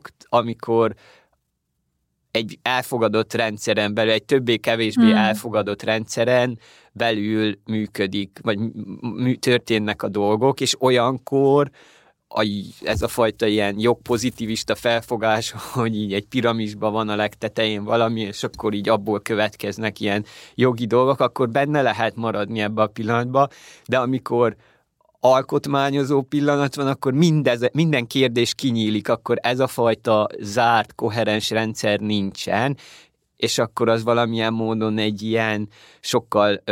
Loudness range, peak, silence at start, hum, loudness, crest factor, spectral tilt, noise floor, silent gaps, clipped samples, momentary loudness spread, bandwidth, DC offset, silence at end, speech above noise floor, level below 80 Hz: 3 LU; -4 dBFS; 0.05 s; none; -21 LUFS; 16 dB; -5 dB/octave; -74 dBFS; none; under 0.1%; 7 LU; 17 kHz; under 0.1%; 0 s; 53 dB; -54 dBFS